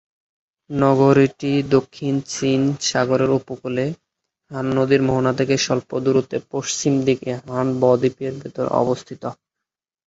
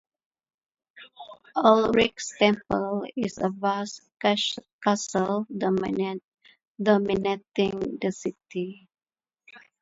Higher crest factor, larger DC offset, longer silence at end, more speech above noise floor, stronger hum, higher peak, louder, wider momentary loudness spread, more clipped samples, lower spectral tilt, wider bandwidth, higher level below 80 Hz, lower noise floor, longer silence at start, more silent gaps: about the same, 18 dB vs 22 dB; neither; first, 0.75 s vs 0.25 s; first, 66 dB vs 32 dB; neither; about the same, -2 dBFS vs -4 dBFS; first, -20 LUFS vs -26 LUFS; about the same, 11 LU vs 12 LU; neither; about the same, -5.5 dB/octave vs -4.5 dB/octave; about the same, 8.2 kHz vs 8 kHz; about the same, -56 dBFS vs -58 dBFS; first, -85 dBFS vs -58 dBFS; second, 0.7 s vs 0.95 s; second, none vs 4.73-4.79 s, 6.24-6.32 s, 6.67-6.75 s